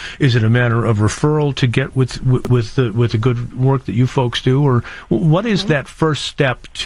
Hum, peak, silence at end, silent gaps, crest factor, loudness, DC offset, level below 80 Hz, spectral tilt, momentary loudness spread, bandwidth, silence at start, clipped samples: none; -4 dBFS; 0 s; none; 12 dB; -16 LUFS; 0.2%; -38 dBFS; -6.5 dB/octave; 4 LU; 11 kHz; 0 s; under 0.1%